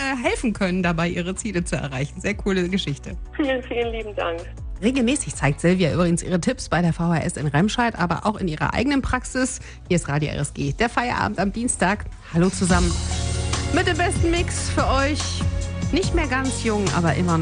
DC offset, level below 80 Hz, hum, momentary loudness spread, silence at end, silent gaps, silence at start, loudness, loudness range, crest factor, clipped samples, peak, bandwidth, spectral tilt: under 0.1%; -34 dBFS; none; 7 LU; 0 s; none; 0 s; -22 LUFS; 3 LU; 18 dB; under 0.1%; -4 dBFS; 10 kHz; -5 dB/octave